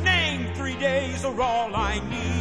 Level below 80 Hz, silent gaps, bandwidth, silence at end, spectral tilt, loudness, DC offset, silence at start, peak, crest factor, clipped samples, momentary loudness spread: -38 dBFS; none; 11 kHz; 0 s; -4.5 dB/octave; -25 LUFS; 0.3%; 0 s; -10 dBFS; 16 dB; under 0.1%; 6 LU